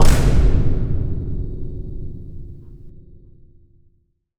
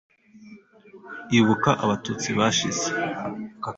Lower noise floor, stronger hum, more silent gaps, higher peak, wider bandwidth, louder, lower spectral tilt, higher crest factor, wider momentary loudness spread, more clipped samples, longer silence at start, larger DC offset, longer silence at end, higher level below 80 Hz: first, -62 dBFS vs -48 dBFS; neither; neither; first, 0 dBFS vs -4 dBFS; first, 13 kHz vs 8 kHz; about the same, -22 LUFS vs -23 LUFS; first, -6.5 dB/octave vs -4 dB/octave; about the same, 16 dB vs 20 dB; first, 23 LU vs 13 LU; neither; second, 0 s vs 0.35 s; neither; about the same, 0 s vs 0 s; first, -20 dBFS vs -58 dBFS